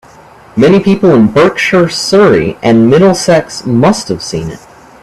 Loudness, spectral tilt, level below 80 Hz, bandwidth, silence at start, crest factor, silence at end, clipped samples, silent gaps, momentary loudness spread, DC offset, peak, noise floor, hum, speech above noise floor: -8 LUFS; -5.5 dB/octave; -40 dBFS; 13 kHz; 0.55 s; 8 dB; 0.45 s; under 0.1%; none; 10 LU; 0.2%; 0 dBFS; -37 dBFS; none; 29 dB